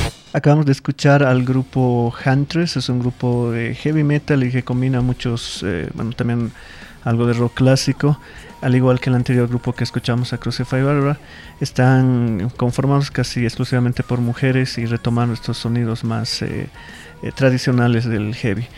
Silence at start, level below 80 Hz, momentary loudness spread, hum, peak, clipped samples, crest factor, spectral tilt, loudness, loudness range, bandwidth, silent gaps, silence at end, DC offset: 0 s; -42 dBFS; 9 LU; none; -2 dBFS; under 0.1%; 16 dB; -7 dB/octave; -18 LUFS; 3 LU; 12 kHz; none; 0 s; under 0.1%